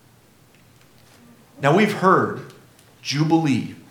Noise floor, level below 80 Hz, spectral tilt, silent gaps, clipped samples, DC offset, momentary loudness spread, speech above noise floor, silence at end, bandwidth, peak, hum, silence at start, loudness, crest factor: -53 dBFS; -68 dBFS; -6 dB/octave; none; under 0.1%; under 0.1%; 11 LU; 35 dB; 0.1 s; 17.5 kHz; -2 dBFS; none; 1.6 s; -19 LUFS; 20 dB